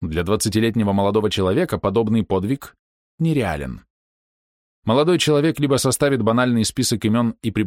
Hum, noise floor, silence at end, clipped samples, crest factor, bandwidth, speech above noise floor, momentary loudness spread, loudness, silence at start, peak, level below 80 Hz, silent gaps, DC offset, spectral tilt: none; under -90 dBFS; 0 s; under 0.1%; 14 dB; 16.5 kHz; over 71 dB; 7 LU; -19 LUFS; 0 s; -6 dBFS; -44 dBFS; 2.79-3.18 s, 3.90-4.82 s; under 0.1%; -5.5 dB/octave